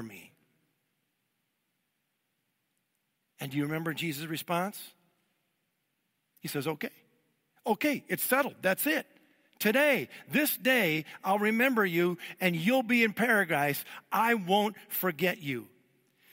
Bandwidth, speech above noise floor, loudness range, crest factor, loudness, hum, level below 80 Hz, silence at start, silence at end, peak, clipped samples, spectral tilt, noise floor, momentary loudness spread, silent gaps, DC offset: 16 kHz; 51 dB; 11 LU; 20 dB; -29 LUFS; none; -80 dBFS; 0 s; 0.65 s; -12 dBFS; under 0.1%; -4.5 dB/octave; -80 dBFS; 12 LU; none; under 0.1%